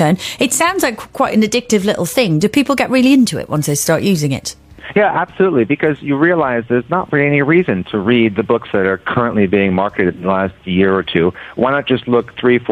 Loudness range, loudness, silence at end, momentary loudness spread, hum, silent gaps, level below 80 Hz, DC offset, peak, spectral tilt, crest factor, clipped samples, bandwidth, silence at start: 1 LU; -14 LUFS; 0 s; 5 LU; none; none; -48 dBFS; under 0.1%; 0 dBFS; -5 dB/octave; 14 dB; under 0.1%; 15.5 kHz; 0 s